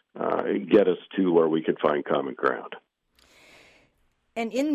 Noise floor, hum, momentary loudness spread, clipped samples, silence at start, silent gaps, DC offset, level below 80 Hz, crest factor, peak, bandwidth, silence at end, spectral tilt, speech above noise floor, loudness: -68 dBFS; none; 14 LU; under 0.1%; 0.15 s; none; under 0.1%; -68 dBFS; 18 dB; -8 dBFS; 12 kHz; 0 s; -6.5 dB/octave; 45 dB; -25 LUFS